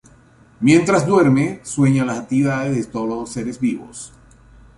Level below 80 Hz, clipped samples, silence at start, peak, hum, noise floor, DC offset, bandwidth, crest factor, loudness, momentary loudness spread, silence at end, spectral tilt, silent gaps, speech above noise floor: -50 dBFS; under 0.1%; 0.6 s; -2 dBFS; none; -49 dBFS; under 0.1%; 11.5 kHz; 18 dB; -18 LUFS; 13 LU; 0.7 s; -6.5 dB/octave; none; 32 dB